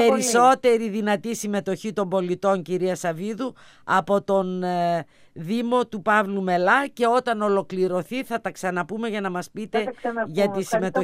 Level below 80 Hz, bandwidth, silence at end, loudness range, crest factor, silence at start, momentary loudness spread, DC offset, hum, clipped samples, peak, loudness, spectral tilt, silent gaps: -68 dBFS; 15.5 kHz; 0 s; 4 LU; 18 dB; 0 s; 10 LU; under 0.1%; none; under 0.1%; -4 dBFS; -23 LUFS; -4.5 dB/octave; none